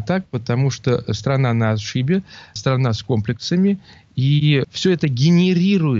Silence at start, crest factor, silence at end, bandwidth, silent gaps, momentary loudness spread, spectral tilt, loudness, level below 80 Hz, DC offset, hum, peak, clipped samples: 0 s; 14 dB; 0 s; 7.6 kHz; none; 7 LU; -6.5 dB/octave; -19 LUFS; -52 dBFS; under 0.1%; none; -4 dBFS; under 0.1%